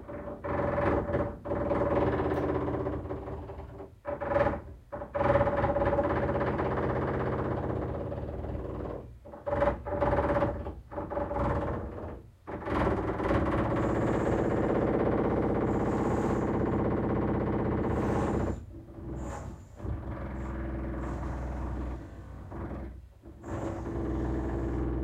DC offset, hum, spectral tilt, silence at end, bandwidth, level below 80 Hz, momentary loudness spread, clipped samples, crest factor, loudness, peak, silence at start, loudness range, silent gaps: under 0.1%; none; -8.5 dB/octave; 0 s; 9.8 kHz; -42 dBFS; 14 LU; under 0.1%; 20 dB; -31 LUFS; -12 dBFS; 0 s; 9 LU; none